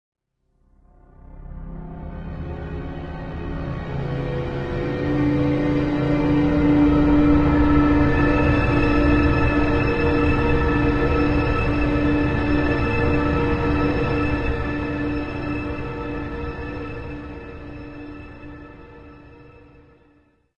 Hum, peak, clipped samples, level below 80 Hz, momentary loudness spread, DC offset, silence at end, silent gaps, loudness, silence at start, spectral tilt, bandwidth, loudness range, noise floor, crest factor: none; -6 dBFS; under 0.1%; -30 dBFS; 19 LU; under 0.1%; 1.05 s; none; -21 LUFS; 1.3 s; -9 dB/octave; 7 kHz; 17 LU; -64 dBFS; 16 dB